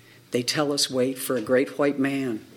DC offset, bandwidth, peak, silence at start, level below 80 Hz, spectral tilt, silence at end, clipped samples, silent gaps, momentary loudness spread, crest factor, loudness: under 0.1%; 17.5 kHz; -8 dBFS; 0.3 s; -70 dBFS; -3.5 dB/octave; 0.1 s; under 0.1%; none; 5 LU; 16 dB; -24 LUFS